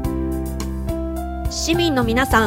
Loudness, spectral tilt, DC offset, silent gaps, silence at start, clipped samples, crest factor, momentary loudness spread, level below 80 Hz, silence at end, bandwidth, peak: -21 LUFS; -4.5 dB/octave; under 0.1%; none; 0 s; under 0.1%; 20 dB; 9 LU; -28 dBFS; 0 s; 16.5 kHz; 0 dBFS